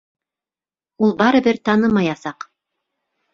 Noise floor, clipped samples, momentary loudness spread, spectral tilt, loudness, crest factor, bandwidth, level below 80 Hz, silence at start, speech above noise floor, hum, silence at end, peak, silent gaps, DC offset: under -90 dBFS; under 0.1%; 18 LU; -6.5 dB/octave; -17 LUFS; 18 dB; 7.2 kHz; -56 dBFS; 1 s; over 74 dB; none; 1 s; -2 dBFS; none; under 0.1%